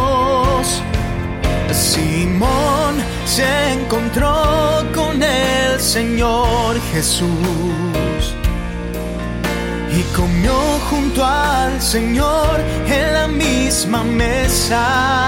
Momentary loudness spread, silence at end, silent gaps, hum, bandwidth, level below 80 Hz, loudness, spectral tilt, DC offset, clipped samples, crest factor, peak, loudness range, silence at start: 6 LU; 0 s; none; none; 16.5 kHz; -24 dBFS; -16 LUFS; -4 dB/octave; under 0.1%; under 0.1%; 12 dB; -4 dBFS; 3 LU; 0 s